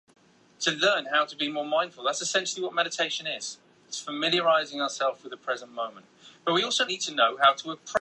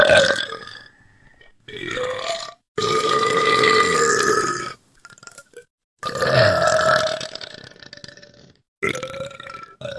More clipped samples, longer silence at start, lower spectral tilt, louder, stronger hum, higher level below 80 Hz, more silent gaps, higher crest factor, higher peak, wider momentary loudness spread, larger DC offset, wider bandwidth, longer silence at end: neither; first, 0.6 s vs 0 s; second, -1.5 dB/octave vs -3 dB/octave; second, -26 LUFS vs -19 LUFS; neither; second, -76 dBFS vs -56 dBFS; second, none vs 2.68-2.75 s, 5.70-5.78 s, 5.84-5.97 s, 8.68-8.81 s; about the same, 20 dB vs 22 dB; second, -8 dBFS vs 0 dBFS; second, 13 LU vs 23 LU; neither; about the same, 11 kHz vs 12 kHz; about the same, 0 s vs 0 s